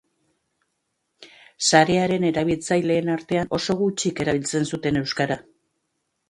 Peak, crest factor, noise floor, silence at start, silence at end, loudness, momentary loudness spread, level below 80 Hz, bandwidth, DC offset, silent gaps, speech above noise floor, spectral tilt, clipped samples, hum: -2 dBFS; 22 dB; -75 dBFS; 1.2 s; 0.9 s; -22 LUFS; 7 LU; -54 dBFS; 11.5 kHz; under 0.1%; none; 54 dB; -4.5 dB/octave; under 0.1%; none